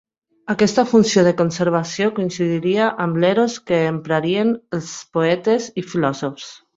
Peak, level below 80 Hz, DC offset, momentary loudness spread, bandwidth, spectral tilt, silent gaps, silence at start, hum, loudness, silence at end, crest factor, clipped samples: -2 dBFS; -58 dBFS; under 0.1%; 11 LU; 8 kHz; -5.5 dB/octave; none; 0.45 s; none; -19 LUFS; 0.2 s; 18 dB; under 0.1%